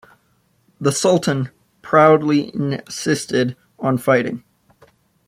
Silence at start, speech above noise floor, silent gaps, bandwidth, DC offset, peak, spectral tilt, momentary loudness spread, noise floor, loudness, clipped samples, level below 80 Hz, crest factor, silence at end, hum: 0.8 s; 45 dB; none; 15.5 kHz; under 0.1%; -2 dBFS; -5.5 dB/octave; 12 LU; -62 dBFS; -18 LUFS; under 0.1%; -60 dBFS; 18 dB; 0.9 s; none